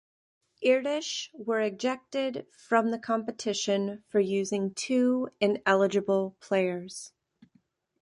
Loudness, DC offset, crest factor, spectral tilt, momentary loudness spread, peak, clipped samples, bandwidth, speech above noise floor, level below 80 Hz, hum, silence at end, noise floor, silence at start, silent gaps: -28 LUFS; under 0.1%; 20 dB; -4.5 dB/octave; 9 LU; -10 dBFS; under 0.1%; 11.5 kHz; 41 dB; -76 dBFS; none; 0.95 s; -69 dBFS; 0.6 s; none